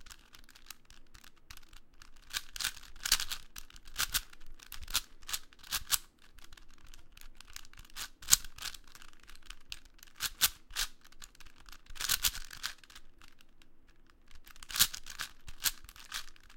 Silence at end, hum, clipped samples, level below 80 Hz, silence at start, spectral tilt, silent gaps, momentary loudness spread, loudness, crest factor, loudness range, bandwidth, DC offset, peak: 0 s; none; under 0.1%; -52 dBFS; 0 s; 1.5 dB/octave; none; 26 LU; -34 LUFS; 38 dB; 4 LU; 17 kHz; under 0.1%; -2 dBFS